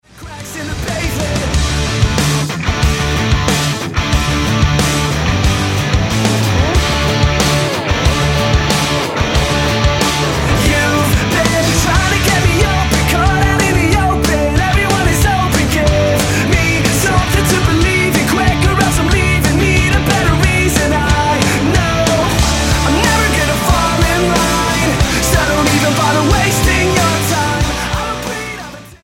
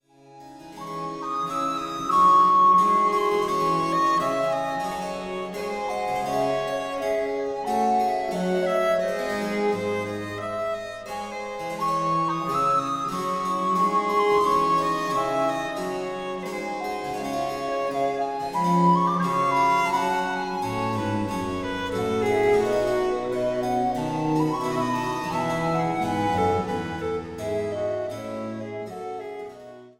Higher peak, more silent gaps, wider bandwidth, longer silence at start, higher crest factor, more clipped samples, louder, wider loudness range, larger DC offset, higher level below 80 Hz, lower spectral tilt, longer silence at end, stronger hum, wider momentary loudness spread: first, 0 dBFS vs -8 dBFS; neither; about the same, 17 kHz vs 16.5 kHz; second, 0.15 s vs 0.3 s; about the same, 12 dB vs 16 dB; neither; first, -13 LUFS vs -24 LUFS; second, 2 LU vs 7 LU; neither; first, -20 dBFS vs -54 dBFS; about the same, -4.5 dB/octave vs -5.5 dB/octave; about the same, 0.1 s vs 0.1 s; neither; second, 4 LU vs 11 LU